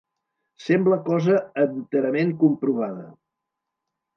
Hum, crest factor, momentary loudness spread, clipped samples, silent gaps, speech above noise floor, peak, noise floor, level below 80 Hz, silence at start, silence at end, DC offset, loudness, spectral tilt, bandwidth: none; 18 dB; 9 LU; under 0.1%; none; 62 dB; -6 dBFS; -83 dBFS; -74 dBFS; 0.6 s; 1.05 s; under 0.1%; -22 LUFS; -8.5 dB/octave; 6.8 kHz